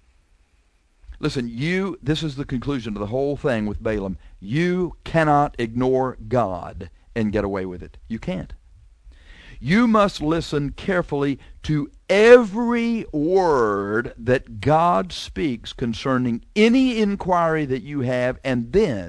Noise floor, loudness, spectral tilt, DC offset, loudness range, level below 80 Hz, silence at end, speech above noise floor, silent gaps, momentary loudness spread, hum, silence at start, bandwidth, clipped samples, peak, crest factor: -61 dBFS; -21 LUFS; -6.5 dB/octave; under 0.1%; 7 LU; -42 dBFS; 0 s; 40 dB; none; 12 LU; none; 1.1 s; 11 kHz; under 0.1%; 0 dBFS; 22 dB